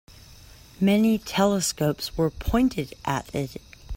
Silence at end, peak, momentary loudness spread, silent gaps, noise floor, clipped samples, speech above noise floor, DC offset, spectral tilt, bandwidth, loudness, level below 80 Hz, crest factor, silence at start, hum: 0 s; -8 dBFS; 10 LU; none; -48 dBFS; under 0.1%; 24 dB; under 0.1%; -5 dB/octave; 16.5 kHz; -24 LUFS; -40 dBFS; 18 dB; 0.1 s; none